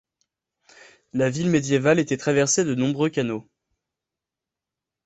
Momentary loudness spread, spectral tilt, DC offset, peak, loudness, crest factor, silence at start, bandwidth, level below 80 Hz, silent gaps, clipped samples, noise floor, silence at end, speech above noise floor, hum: 8 LU; -5 dB/octave; under 0.1%; -4 dBFS; -22 LUFS; 20 dB; 1.15 s; 8.4 kHz; -60 dBFS; none; under 0.1%; -87 dBFS; 1.65 s; 66 dB; none